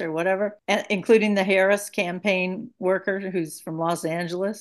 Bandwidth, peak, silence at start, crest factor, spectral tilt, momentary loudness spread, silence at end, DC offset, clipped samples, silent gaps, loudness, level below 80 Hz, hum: 12.5 kHz; -6 dBFS; 0 s; 18 dB; -5 dB/octave; 9 LU; 0 s; under 0.1%; under 0.1%; none; -23 LUFS; -74 dBFS; none